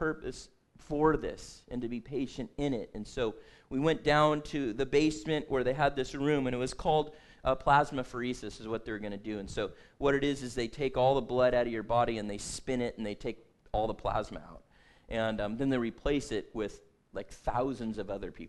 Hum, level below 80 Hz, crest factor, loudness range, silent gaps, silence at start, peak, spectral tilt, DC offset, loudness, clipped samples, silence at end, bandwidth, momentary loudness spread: none; -48 dBFS; 20 dB; 5 LU; none; 0 s; -12 dBFS; -5.5 dB/octave; under 0.1%; -32 LUFS; under 0.1%; 0 s; 12 kHz; 13 LU